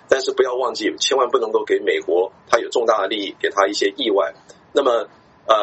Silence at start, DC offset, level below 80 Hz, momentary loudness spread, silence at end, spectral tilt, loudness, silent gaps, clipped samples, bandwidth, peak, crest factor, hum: 0.1 s; under 0.1%; -66 dBFS; 5 LU; 0 s; -1.5 dB/octave; -19 LUFS; none; under 0.1%; 8.2 kHz; 0 dBFS; 20 dB; none